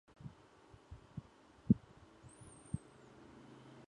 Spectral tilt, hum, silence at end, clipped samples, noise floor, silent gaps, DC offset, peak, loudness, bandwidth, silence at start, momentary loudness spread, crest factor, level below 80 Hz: -8 dB/octave; none; 1.1 s; under 0.1%; -63 dBFS; none; under 0.1%; -16 dBFS; -40 LUFS; 10.5 kHz; 0.25 s; 27 LU; 28 dB; -62 dBFS